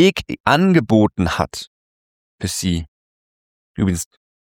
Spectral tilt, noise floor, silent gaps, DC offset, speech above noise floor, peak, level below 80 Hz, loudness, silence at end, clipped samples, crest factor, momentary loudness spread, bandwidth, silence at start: -5.5 dB/octave; under -90 dBFS; 0.40-0.44 s, 1.67-2.38 s, 2.88-3.75 s; under 0.1%; over 73 dB; -2 dBFS; -42 dBFS; -18 LUFS; 0.4 s; under 0.1%; 18 dB; 18 LU; 17.5 kHz; 0 s